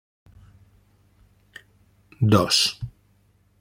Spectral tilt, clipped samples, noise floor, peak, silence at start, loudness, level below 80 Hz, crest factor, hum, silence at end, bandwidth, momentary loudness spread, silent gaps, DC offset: -4.5 dB/octave; under 0.1%; -61 dBFS; -4 dBFS; 2.2 s; -20 LUFS; -56 dBFS; 24 dB; 50 Hz at -50 dBFS; 0.7 s; 16.5 kHz; 20 LU; none; under 0.1%